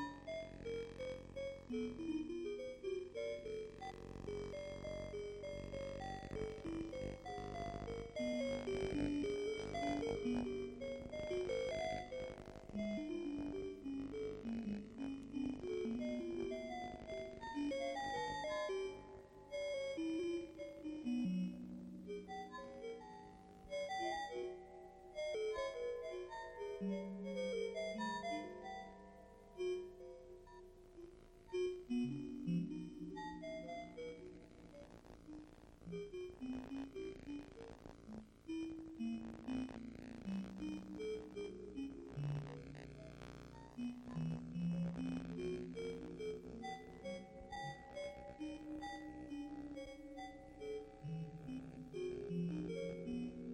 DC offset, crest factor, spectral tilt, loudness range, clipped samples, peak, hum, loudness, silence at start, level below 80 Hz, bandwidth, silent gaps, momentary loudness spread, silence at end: under 0.1%; 18 dB; -6.5 dB/octave; 7 LU; under 0.1%; -28 dBFS; none; -46 LUFS; 0 s; -62 dBFS; 11 kHz; none; 13 LU; 0 s